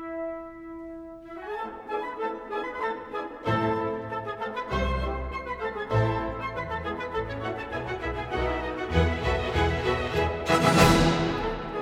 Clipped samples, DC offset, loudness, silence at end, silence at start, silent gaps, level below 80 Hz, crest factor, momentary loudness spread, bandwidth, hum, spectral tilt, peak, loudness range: under 0.1%; under 0.1%; -28 LUFS; 0 s; 0 s; none; -38 dBFS; 24 dB; 13 LU; 18.5 kHz; none; -5.5 dB/octave; -4 dBFS; 7 LU